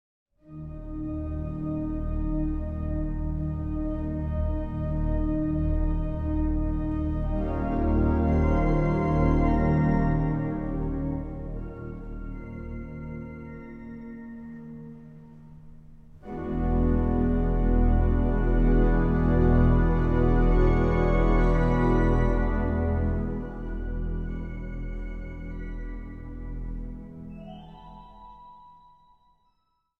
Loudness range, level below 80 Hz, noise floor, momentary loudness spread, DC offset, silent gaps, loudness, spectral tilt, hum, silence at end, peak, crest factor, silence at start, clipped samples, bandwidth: 17 LU; -28 dBFS; -74 dBFS; 18 LU; 0.1%; none; -27 LUFS; -10.5 dB/octave; none; 1.3 s; -10 dBFS; 16 dB; 0.5 s; under 0.1%; 4.1 kHz